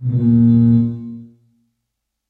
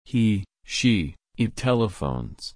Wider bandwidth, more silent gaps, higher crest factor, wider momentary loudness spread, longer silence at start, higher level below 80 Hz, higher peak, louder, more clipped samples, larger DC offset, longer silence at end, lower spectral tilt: second, 1.7 kHz vs 10.5 kHz; neither; about the same, 12 dB vs 16 dB; first, 18 LU vs 8 LU; about the same, 0 s vs 0.1 s; about the same, -46 dBFS vs -44 dBFS; first, -4 dBFS vs -8 dBFS; first, -14 LUFS vs -25 LUFS; neither; neither; first, 1.05 s vs 0.05 s; first, -13 dB/octave vs -5.5 dB/octave